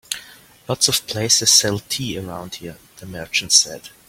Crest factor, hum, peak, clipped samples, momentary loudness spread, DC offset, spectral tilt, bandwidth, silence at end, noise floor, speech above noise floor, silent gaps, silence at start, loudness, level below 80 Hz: 22 dB; none; 0 dBFS; under 0.1%; 21 LU; under 0.1%; -1.5 dB/octave; 16.5 kHz; 0.2 s; -44 dBFS; 23 dB; none; 0.1 s; -16 LUFS; -54 dBFS